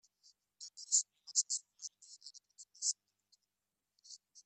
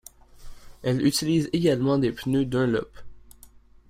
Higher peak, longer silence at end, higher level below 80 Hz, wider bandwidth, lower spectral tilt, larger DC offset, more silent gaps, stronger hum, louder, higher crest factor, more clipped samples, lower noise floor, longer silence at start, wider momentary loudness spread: second, -18 dBFS vs -10 dBFS; second, 0.05 s vs 0.45 s; second, under -90 dBFS vs -50 dBFS; second, 12.5 kHz vs 16 kHz; second, 7 dB/octave vs -6 dB/octave; neither; neither; neither; second, -35 LUFS vs -24 LUFS; first, 26 dB vs 16 dB; neither; first, under -90 dBFS vs -51 dBFS; first, 0.6 s vs 0.4 s; first, 23 LU vs 7 LU